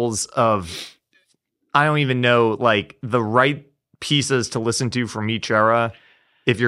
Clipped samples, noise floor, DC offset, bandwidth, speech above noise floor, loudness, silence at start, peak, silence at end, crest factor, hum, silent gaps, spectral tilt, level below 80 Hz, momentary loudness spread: under 0.1%; -68 dBFS; under 0.1%; 14 kHz; 49 dB; -19 LUFS; 0 s; -2 dBFS; 0 s; 20 dB; none; none; -4.5 dB/octave; -56 dBFS; 9 LU